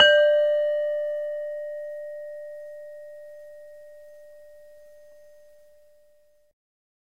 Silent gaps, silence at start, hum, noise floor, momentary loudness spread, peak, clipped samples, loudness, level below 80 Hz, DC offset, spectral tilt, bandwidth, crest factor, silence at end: none; 0 s; none; -62 dBFS; 27 LU; -4 dBFS; under 0.1%; -24 LUFS; -72 dBFS; 0.2%; -0.5 dB/octave; 7.8 kHz; 24 dB; 2.8 s